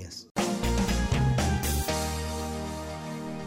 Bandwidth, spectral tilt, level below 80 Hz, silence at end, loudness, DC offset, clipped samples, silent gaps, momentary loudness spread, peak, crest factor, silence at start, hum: 16 kHz; -5 dB/octave; -36 dBFS; 0 s; -29 LUFS; under 0.1%; under 0.1%; 0.31-0.35 s; 10 LU; -16 dBFS; 14 dB; 0 s; none